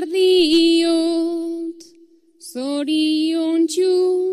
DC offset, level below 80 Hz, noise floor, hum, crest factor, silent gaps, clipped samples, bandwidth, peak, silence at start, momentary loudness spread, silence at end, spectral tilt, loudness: under 0.1%; -62 dBFS; -51 dBFS; none; 12 dB; none; under 0.1%; 13.5 kHz; -6 dBFS; 0 s; 14 LU; 0 s; -2.5 dB/octave; -18 LUFS